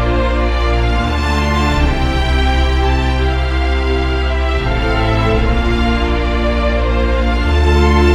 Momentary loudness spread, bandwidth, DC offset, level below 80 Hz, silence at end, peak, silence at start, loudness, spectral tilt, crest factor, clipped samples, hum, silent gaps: 2 LU; 9.2 kHz; under 0.1%; -16 dBFS; 0 s; 0 dBFS; 0 s; -15 LUFS; -6.5 dB/octave; 12 dB; under 0.1%; none; none